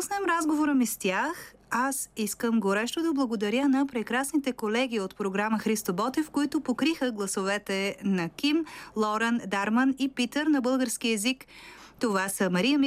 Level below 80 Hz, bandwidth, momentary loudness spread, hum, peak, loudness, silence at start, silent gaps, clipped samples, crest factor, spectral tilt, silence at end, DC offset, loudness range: -64 dBFS; 16 kHz; 5 LU; none; -14 dBFS; -28 LUFS; 0 s; none; under 0.1%; 14 dB; -4 dB/octave; 0 s; under 0.1%; 1 LU